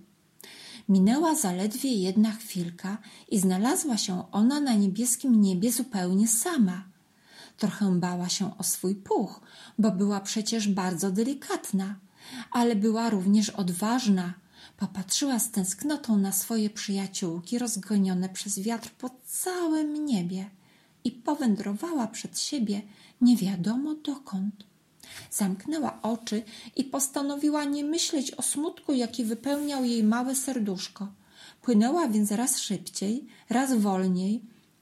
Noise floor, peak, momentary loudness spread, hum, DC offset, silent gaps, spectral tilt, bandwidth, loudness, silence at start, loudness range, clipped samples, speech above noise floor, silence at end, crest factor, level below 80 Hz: -57 dBFS; -12 dBFS; 12 LU; none; under 0.1%; none; -4.5 dB/octave; 15.5 kHz; -27 LUFS; 0.45 s; 5 LU; under 0.1%; 30 dB; 0.35 s; 16 dB; -74 dBFS